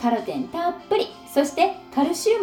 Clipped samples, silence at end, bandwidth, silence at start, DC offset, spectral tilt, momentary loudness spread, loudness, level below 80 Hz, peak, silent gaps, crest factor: under 0.1%; 0 s; over 20 kHz; 0 s; under 0.1%; -3.5 dB/octave; 6 LU; -24 LUFS; -62 dBFS; -6 dBFS; none; 16 dB